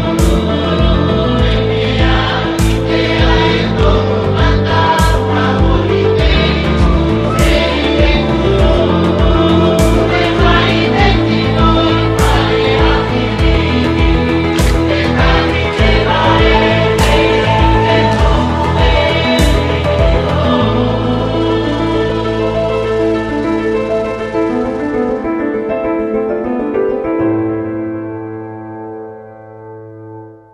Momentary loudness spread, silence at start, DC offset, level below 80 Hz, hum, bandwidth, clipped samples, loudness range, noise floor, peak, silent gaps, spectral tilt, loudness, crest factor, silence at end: 6 LU; 0 s; under 0.1%; -18 dBFS; none; 14 kHz; under 0.1%; 5 LU; -32 dBFS; 0 dBFS; none; -6.5 dB/octave; -12 LUFS; 12 dB; 0.2 s